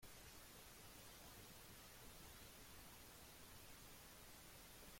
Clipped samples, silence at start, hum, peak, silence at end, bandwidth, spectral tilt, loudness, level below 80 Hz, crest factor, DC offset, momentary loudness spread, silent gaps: under 0.1%; 0 s; none; -48 dBFS; 0 s; 16.5 kHz; -2.5 dB/octave; -60 LUFS; -70 dBFS; 14 dB; under 0.1%; 1 LU; none